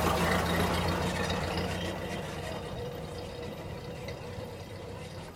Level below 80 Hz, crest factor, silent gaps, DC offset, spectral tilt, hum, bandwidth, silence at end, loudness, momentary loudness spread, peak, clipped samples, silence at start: -48 dBFS; 18 dB; none; under 0.1%; -5 dB/octave; none; 16.5 kHz; 0 s; -34 LUFS; 14 LU; -14 dBFS; under 0.1%; 0 s